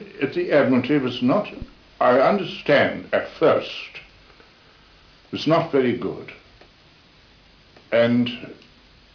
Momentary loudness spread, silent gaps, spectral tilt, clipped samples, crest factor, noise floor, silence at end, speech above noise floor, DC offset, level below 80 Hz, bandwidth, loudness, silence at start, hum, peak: 18 LU; none; -7 dB/octave; under 0.1%; 16 dB; -53 dBFS; 0.6 s; 32 dB; under 0.1%; -54 dBFS; 5.4 kHz; -21 LUFS; 0 s; none; -6 dBFS